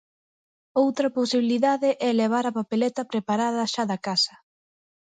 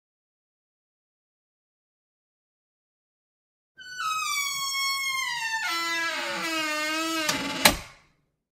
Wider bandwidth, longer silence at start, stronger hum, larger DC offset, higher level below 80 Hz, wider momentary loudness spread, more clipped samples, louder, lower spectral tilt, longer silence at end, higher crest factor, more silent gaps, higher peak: second, 9.4 kHz vs 16 kHz; second, 0.75 s vs 3.8 s; neither; neither; second, -74 dBFS vs -54 dBFS; second, 4 LU vs 7 LU; neither; about the same, -24 LUFS vs -26 LUFS; first, -4.5 dB/octave vs -1 dB/octave; first, 0.75 s vs 0.6 s; second, 16 dB vs 30 dB; neither; second, -8 dBFS vs 0 dBFS